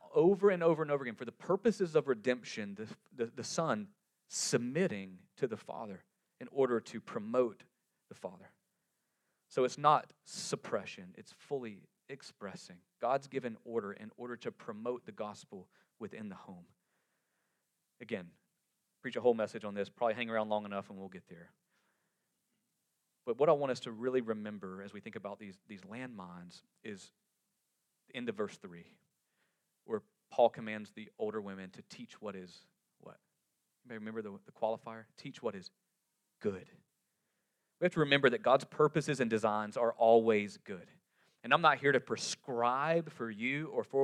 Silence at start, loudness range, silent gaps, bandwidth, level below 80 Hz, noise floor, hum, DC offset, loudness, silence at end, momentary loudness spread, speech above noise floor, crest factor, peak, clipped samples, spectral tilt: 0.05 s; 16 LU; none; 13 kHz; -84 dBFS; -83 dBFS; none; under 0.1%; -35 LUFS; 0 s; 21 LU; 48 dB; 26 dB; -12 dBFS; under 0.1%; -5 dB/octave